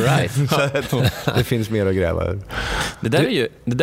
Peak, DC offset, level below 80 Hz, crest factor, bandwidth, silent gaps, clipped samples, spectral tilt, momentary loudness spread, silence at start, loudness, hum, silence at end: -2 dBFS; under 0.1%; -38 dBFS; 18 dB; 16 kHz; none; under 0.1%; -5.5 dB/octave; 6 LU; 0 s; -20 LUFS; none; 0 s